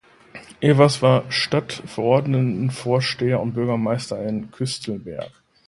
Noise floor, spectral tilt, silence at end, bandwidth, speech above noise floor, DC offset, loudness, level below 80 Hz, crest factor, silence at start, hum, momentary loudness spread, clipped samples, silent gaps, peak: -44 dBFS; -6 dB/octave; 0.4 s; 11.5 kHz; 24 dB; under 0.1%; -21 LUFS; -56 dBFS; 20 dB; 0.35 s; none; 15 LU; under 0.1%; none; -2 dBFS